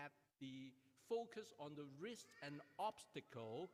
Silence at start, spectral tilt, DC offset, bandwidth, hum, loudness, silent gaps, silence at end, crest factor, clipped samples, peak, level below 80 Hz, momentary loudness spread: 0 s; -5 dB/octave; under 0.1%; 15.5 kHz; none; -53 LUFS; none; 0 s; 20 dB; under 0.1%; -34 dBFS; under -90 dBFS; 10 LU